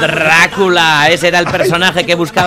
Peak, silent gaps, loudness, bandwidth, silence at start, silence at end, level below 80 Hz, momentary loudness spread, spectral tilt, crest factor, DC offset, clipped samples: 0 dBFS; none; -9 LUFS; 16.5 kHz; 0 s; 0 s; -44 dBFS; 4 LU; -3.5 dB/octave; 10 dB; under 0.1%; under 0.1%